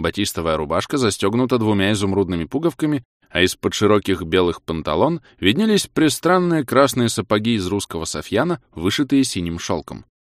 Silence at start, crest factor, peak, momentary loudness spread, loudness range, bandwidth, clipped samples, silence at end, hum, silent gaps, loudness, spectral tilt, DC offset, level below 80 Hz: 0 s; 18 dB; -2 dBFS; 8 LU; 2 LU; 15.5 kHz; under 0.1%; 0.3 s; none; 3.05-3.20 s; -19 LUFS; -5 dB/octave; under 0.1%; -46 dBFS